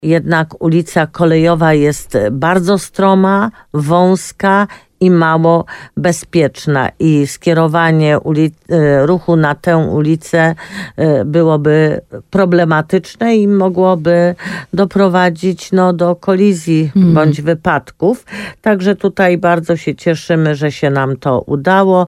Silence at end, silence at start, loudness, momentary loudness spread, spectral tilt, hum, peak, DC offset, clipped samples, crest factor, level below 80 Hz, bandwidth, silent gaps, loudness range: 0 s; 0 s; -12 LUFS; 6 LU; -7 dB/octave; none; 0 dBFS; under 0.1%; under 0.1%; 12 dB; -46 dBFS; 13.5 kHz; none; 1 LU